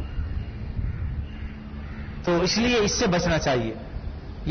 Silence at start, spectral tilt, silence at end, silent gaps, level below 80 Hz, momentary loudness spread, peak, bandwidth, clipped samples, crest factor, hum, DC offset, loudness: 0 s; -4.5 dB/octave; 0 s; none; -34 dBFS; 16 LU; -14 dBFS; 6.6 kHz; under 0.1%; 12 dB; none; under 0.1%; -25 LUFS